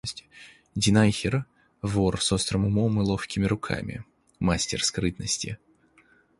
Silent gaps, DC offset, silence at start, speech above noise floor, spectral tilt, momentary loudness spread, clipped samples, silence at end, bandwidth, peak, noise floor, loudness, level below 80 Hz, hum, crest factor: none; under 0.1%; 0.05 s; 35 dB; -4.5 dB/octave; 15 LU; under 0.1%; 0.85 s; 11.5 kHz; -8 dBFS; -61 dBFS; -26 LUFS; -46 dBFS; none; 20 dB